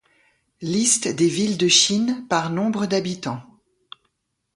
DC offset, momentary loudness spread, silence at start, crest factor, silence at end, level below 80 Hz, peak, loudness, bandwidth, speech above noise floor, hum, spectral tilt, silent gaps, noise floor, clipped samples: under 0.1%; 15 LU; 0.6 s; 20 dB; 1.15 s; -64 dBFS; -4 dBFS; -20 LUFS; 11.5 kHz; 52 dB; none; -3 dB/octave; none; -73 dBFS; under 0.1%